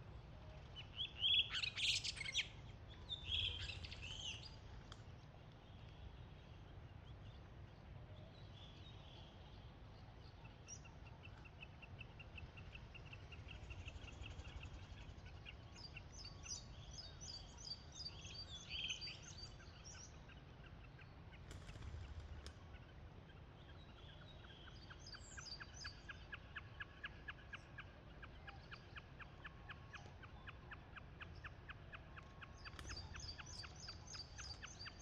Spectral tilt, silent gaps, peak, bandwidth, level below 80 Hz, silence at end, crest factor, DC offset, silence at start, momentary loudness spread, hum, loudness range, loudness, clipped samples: -2.5 dB/octave; none; -28 dBFS; 10 kHz; -62 dBFS; 0 s; 24 dB; under 0.1%; 0 s; 16 LU; none; 15 LU; -50 LUFS; under 0.1%